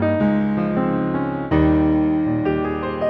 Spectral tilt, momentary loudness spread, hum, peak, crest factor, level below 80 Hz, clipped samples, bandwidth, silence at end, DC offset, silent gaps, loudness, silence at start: -10.5 dB/octave; 6 LU; none; -6 dBFS; 12 dB; -36 dBFS; under 0.1%; 4.7 kHz; 0 s; under 0.1%; none; -19 LUFS; 0 s